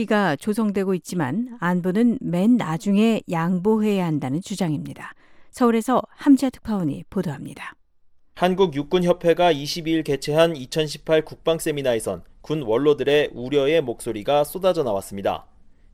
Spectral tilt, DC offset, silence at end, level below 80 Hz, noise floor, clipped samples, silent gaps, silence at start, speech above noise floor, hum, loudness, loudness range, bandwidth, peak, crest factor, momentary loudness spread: -6 dB/octave; under 0.1%; 0.5 s; -50 dBFS; -53 dBFS; under 0.1%; none; 0 s; 32 dB; none; -22 LUFS; 2 LU; 16.5 kHz; -4 dBFS; 16 dB; 9 LU